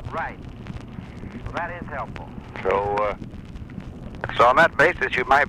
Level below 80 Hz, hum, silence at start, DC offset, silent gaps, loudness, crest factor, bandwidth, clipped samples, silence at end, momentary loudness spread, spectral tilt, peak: -42 dBFS; none; 0 s; under 0.1%; none; -22 LUFS; 16 dB; 15.5 kHz; under 0.1%; 0 s; 21 LU; -5.5 dB/octave; -8 dBFS